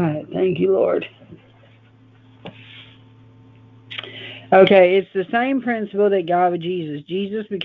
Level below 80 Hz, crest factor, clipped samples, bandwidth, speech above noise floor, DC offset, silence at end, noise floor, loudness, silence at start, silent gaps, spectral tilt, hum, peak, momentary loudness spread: -62 dBFS; 20 dB; under 0.1%; 4.7 kHz; 32 dB; under 0.1%; 0 s; -50 dBFS; -18 LUFS; 0 s; none; -9 dB/octave; none; 0 dBFS; 21 LU